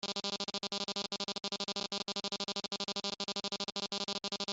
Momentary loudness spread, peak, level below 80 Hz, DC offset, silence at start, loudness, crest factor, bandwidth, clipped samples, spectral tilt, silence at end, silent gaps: 1 LU; -20 dBFS; -76 dBFS; under 0.1%; 0.05 s; -37 LUFS; 20 dB; 8.2 kHz; under 0.1%; -2 dB/octave; 0 s; none